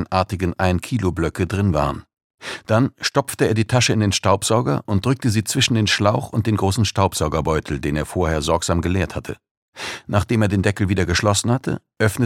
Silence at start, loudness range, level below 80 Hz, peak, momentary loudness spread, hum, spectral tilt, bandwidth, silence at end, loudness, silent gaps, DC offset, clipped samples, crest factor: 0 s; 3 LU; -38 dBFS; -2 dBFS; 8 LU; none; -5 dB/octave; 16 kHz; 0 s; -20 LUFS; 2.24-2.38 s, 9.51-9.72 s; under 0.1%; under 0.1%; 18 dB